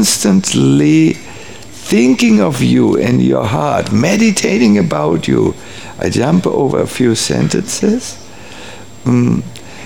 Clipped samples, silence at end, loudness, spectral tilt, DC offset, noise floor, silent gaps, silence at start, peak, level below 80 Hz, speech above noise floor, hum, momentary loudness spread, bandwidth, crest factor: under 0.1%; 0 s; -12 LUFS; -5 dB/octave; 2%; -32 dBFS; none; 0 s; 0 dBFS; -44 dBFS; 21 dB; none; 19 LU; 17.5 kHz; 12 dB